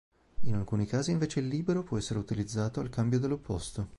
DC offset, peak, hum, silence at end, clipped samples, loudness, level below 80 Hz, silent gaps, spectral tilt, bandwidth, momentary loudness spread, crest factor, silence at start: under 0.1%; -16 dBFS; none; 0 s; under 0.1%; -32 LUFS; -50 dBFS; none; -6.5 dB/octave; 11.5 kHz; 6 LU; 14 dB; 0.1 s